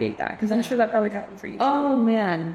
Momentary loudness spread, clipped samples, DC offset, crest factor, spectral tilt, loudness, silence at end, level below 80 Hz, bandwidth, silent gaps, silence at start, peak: 7 LU; under 0.1%; under 0.1%; 14 dB; -6.5 dB/octave; -23 LUFS; 0 s; -62 dBFS; 13.5 kHz; none; 0 s; -8 dBFS